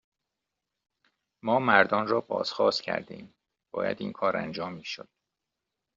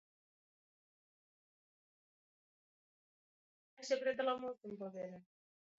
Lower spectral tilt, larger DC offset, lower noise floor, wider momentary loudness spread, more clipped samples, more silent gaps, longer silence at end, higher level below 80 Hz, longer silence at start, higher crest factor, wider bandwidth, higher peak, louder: about the same, -2.5 dB/octave vs -2.5 dB/octave; neither; second, -86 dBFS vs under -90 dBFS; first, 17 LU vs 14 LU; neither; neither; first, 0.95 s vs 0.55 s; first, -72 dBFS vs under -90 dBFS; second, 1.45 s vs 3.8 s; about the same, 26 dB vs 22 dB; about the same, 7.6 kHz vs 7.4 kHz; first, -4 dBFS vs -24 dBFS; first, -27 LUFS vs -41 LUFS